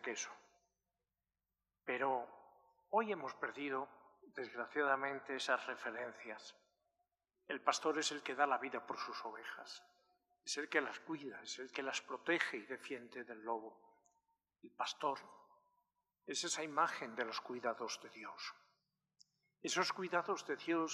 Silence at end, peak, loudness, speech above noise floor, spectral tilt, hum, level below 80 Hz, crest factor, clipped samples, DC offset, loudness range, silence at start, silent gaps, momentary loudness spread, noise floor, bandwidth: 0 s; -18 dBFS; -41 LUFS; over 48 dB; -2 dB/octave; 50 Hz at -85 dBFS; under -90 dBFS; 26 dB; under 0.1%; under 0.1%; 3 LU; 0 s; none; 14 LU; under -90 dBFS; 14 kHz